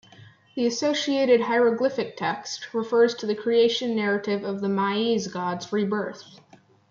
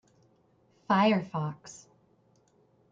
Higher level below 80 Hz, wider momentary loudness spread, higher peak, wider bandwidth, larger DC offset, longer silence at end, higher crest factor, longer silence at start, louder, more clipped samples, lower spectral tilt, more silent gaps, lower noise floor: about the same, -74 dBFS vs -76 dBFS; second, 9 LU vs 24 LU; first, -8 dBFS vs -12 dBFS; about the same, 7.4 kHz vs 7.8 kHz; neither; second, 0.55 s vs 1.2 s; about the same, 16 dB vs 20 dB; second, 0.2 s vs 0.9 s; first, -24 LUFS vs -28 LUFS; neither; second, -4.5 dB/octave vs -6 dB/octave; neither; second, -51 dBFS vs -66 dBFS